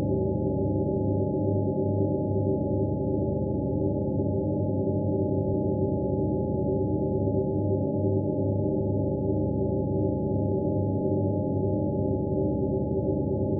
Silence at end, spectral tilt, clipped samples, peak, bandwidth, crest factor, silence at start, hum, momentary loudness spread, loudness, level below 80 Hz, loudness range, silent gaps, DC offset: 0 s; -7 dB/octave; under 0.1%; -14 dBFS; 0.9 kHz; 12 dB; 0 s; none; 1 LU; -27 LUFS; -42 dBFS; 0 LU; none; under 0.1%